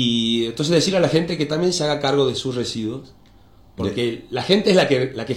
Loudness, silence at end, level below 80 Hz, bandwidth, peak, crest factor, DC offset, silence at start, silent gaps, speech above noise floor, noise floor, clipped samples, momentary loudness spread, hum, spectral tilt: -20 LUFS; 0 s; -52 dBFS; 15.5 kHz; -2 dBFS; 18 dB; under 0.1%; 0 s; none; 29 dB; -49 dBFS; under 0.1%; 10 LU; none; -5 dB/octave